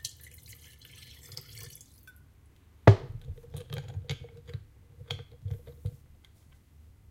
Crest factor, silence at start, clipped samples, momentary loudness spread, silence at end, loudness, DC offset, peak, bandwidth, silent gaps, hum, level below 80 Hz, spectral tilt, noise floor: 30 dB; 0.05 s; under 0.1%; 28 LU; 1.2 s; -30 LUFS; under 0.1%; -4 dBFS; 16.5 kHz; none; none; -50 dBFS; -6.5 dB/octave; -58 dBFS